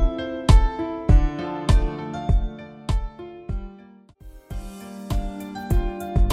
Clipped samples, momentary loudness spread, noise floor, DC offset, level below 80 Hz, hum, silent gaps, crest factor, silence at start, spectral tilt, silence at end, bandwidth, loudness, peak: under 0.1%; 18 LU; -48 dBFS; under 0.1%; -22 dBFS; none; none; 18 dB; 0 s; -7 dB/octave; 0 s; 12.5 kHz; -24 LUFS; -4 dBFS